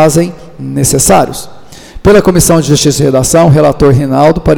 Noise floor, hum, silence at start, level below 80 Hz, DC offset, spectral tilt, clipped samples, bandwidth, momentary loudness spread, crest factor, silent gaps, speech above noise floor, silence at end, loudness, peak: -28 dBFS; none; 0 s; -26 dBFS; under 0.1%; -5 dB/octave; 0.2%; 19 kHz; 11 LU; 8 dB; none; 21 dB; 0 s; -7 LUFS; 0 dBFS